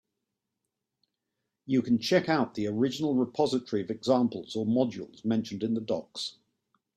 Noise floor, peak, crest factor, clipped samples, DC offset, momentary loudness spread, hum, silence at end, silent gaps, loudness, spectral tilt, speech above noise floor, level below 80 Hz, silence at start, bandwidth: -85 dBFS; -10 dBFS; 20 dB; under 0.1%; under 0.1%; 8 LU; none; 0.65 s; none; -29 LUFS; -6 dB/octave; 57 dB; -70 dBFS; 1.65 s; 13 kHz